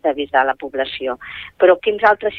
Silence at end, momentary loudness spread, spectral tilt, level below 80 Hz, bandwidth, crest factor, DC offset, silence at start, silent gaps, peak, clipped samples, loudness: 0 s; 12 LU; -6 dB/octave; -54 dBFS; 5.4 kHz; 16 dB; under 0.1%; 0.05 s; none; -2 dBFS; under 0.1%; -17 LUFS